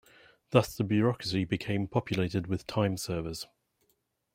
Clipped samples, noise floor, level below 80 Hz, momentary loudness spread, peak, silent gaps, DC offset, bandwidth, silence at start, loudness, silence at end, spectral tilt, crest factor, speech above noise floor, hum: under 0.1%; -76 dBFS; -58 dBFS; 8 LU; -6 dBFS; none; under 0.1%; 16 kHz; 0.5 s; -30 LUFS; 0.9 s; -6 dB/octave; 26 dB; 46 dB; none